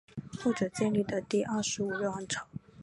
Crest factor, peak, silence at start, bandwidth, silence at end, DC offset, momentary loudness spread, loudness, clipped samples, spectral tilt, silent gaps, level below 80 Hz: 16 dB; -16 dBFS; 0.15 s; 11.5 kHz; 0 s; under 0.1%; 7 LU; -32 LUFS; under 0.1%; -4.5 dB/octave; none; -64 dBFS